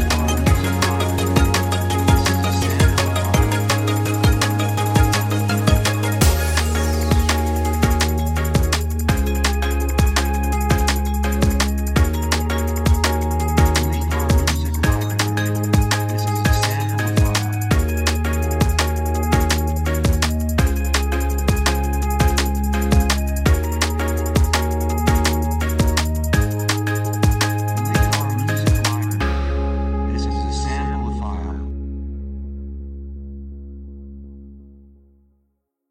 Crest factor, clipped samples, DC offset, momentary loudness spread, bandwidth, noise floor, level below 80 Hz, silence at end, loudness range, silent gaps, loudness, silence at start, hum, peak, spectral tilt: 16 dB; under 0.1%; under 0.1%; 6 LU; 16.5 kHz; -70 dBFS; -22 dBFS; 1.2 s; 7 LU; none; -19 LUFS; 0 s; none; -2 dBFS; -5 dB/octave